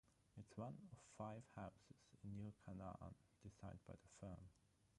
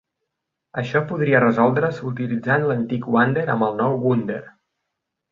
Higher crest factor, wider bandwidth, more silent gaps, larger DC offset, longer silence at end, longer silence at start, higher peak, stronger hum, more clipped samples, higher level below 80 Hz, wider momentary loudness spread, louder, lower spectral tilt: about the same, 20 dB vs 20 dB; first, 11 kHz vs 7.2 kHz; neither; neither; second, 0.05 s vs 0.85 s; second, 0.05 s vs 0.75 s; second, -38 dBFS vs -2 dBFS; neither; neither; second, -72 dBFS vs -60 dBFS; about the same, 9 LU vs 10 LU; second, -58 LUFS vs -20 LUFS; second, -7 dB/octave vs -9 dB/octave